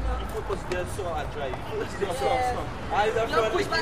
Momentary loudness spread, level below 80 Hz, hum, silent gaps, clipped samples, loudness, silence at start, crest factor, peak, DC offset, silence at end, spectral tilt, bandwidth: 8 LU; -38 dBFS; none; none; under 0.1%; -28 LUFS; 0 s; 18 dB; -10 dBFS; 0.9%; 0 s; -5 dB/octave; 15.5 kHz